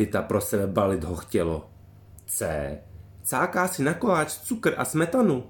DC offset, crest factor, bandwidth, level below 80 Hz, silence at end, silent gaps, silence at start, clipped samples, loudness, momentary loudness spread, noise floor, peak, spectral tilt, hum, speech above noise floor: under 0.1%; 18 dB; 17.5 kHz; -50 dBFS; 0 s; none; 0 s; under 0.1%; -26 LUFS; 9 LU; -49 dBFS; -8 dBFS; -5 dB/octave; none; 24 dB